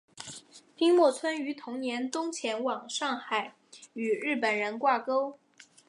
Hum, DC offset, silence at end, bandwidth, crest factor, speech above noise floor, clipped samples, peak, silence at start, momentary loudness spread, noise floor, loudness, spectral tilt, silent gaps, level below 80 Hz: none; under 0.1%; 0.25 s; 11.5 kHz; 18 dB; 21 dB; under 0.1%; -12 dBFS; 0.15 s; 19 LU; -50 dBFS; -29 LUFS; -3 dB/octave; none; -84 dBFS